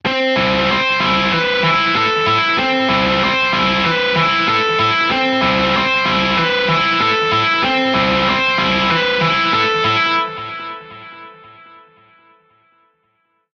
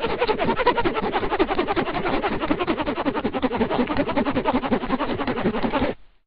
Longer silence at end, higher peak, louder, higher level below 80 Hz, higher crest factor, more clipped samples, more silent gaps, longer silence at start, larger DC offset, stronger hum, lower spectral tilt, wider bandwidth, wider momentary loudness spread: first, 2.05 s vs 0.2 s; about the same, -2 dBFS vs -4 dBFS; first, -14 LUFS vs -23 LUFS; about the same, -42 dBFS vs -38 dBFS; about the same, 14 dB vs 18 dB; neither; neither; about the same, 0.05 s vs 0 s; neither; neither; about the same, -4.5 dB/octave vs -4 dB/octave; first, 7.4 kHz vs 5.4 kHz; about the same, 2 LU vs 4 LU